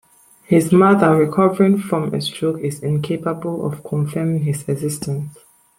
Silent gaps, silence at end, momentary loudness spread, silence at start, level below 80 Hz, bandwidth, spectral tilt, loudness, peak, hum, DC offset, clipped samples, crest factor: none; 0.5 s; 11 LU; 0.5 s; -56 dBFS; 16.5 kHz; -7 dB/octave; -18 LUFS; -2 dBFS; none; under 0.1%; under 0.1%; 16 dB